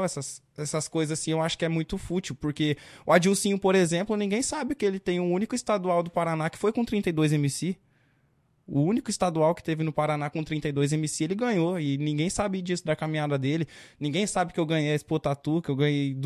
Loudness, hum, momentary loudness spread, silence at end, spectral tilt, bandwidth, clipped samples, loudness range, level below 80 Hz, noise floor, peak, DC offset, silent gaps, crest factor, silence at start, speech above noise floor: -27 LUFS; none; 7 LU; 0 s; -5.5 dB/octave; 14 kHz; under 0.1%; 3 LU; -56 dBFS; -67 dBFS; -6 dBFS; under 0.1%; none; 20 dB; 0 s; 40 dB